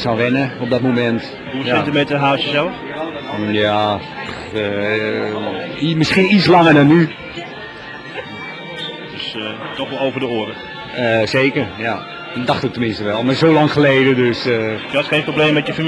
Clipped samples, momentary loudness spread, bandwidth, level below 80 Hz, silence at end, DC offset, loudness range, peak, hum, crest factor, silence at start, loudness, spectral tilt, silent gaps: under 0.1%; 15 LU; 11 kHz; -50 dBFS; 0 s; under 0.1%; 7 LU; 0 dBFS; none; 16 dB; 0 s; -16 LUFS; -6.5 dB/octave; none